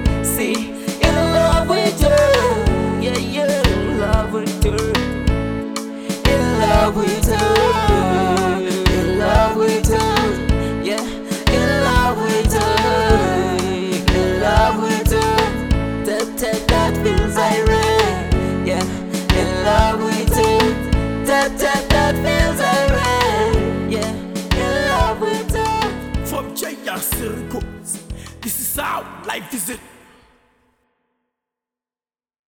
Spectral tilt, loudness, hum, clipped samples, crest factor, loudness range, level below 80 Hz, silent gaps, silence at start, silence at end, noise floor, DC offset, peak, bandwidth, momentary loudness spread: -5 dB/octave; -17 LUFS; none; under 0.1%; 18 dB; 8 LU; -26 dBFS; none; 0 s; 2.7 s; under -90 dBFS; under 0.1%; 0 dBFS; over 20 kHz; 9 LU